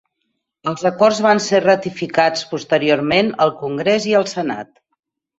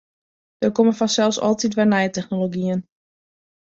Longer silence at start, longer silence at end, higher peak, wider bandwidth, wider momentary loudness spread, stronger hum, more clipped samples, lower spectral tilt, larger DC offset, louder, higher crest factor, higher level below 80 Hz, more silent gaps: about the same, 0.65 s vs 0.6 s; about the same, 0.75 s vs 0.8 s; about the same, -2 dBFS vs -4 dBFS; about the same, 8 kHz vs 7.8 kHz; first, 10 LU vs 6 LU; neither; neither; about the same, -4.5 dB/octave vs -5 dB/octave; neither; first, -17 LUFS vs -20 LUFS; about the same, 16 dB vs 16 dB; about the same, -60 dBFS vs -62 dBFS; neither